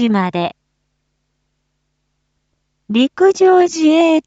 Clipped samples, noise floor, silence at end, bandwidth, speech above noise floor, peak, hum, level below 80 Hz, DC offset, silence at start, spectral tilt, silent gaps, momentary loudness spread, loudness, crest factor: under 0.1%; -69 dBFS; 0.05 s; 8 kHz; 57 dB; 0 dBFS; none; -64 dBFS; under 0.1%; 0 s; -5.5 dB/octave; none; 10 LU; -13 LUFS; 14 dB